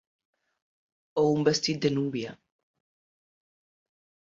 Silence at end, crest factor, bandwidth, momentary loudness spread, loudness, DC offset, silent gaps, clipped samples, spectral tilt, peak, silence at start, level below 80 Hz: 2 s; 22 dB; 7.6 kHz; 11 LU; -27 LUFS; under 0.1%; none; under 0.1%; -5 dB/octave; -10 dBFS; 1.15 s; -68 dBFS